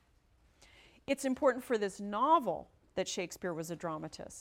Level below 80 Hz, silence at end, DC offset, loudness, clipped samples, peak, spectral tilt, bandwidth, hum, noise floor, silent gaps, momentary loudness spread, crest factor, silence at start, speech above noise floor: -68 dBFS; 0 s; under 0.1%; -34 LUFS; under 0.1%; -16 dBFS; -4.5 dB/octave; 16.5 kHz; none; -68 dBFS; none; 14 LU; 20 dB; 1.1 s; 34 dB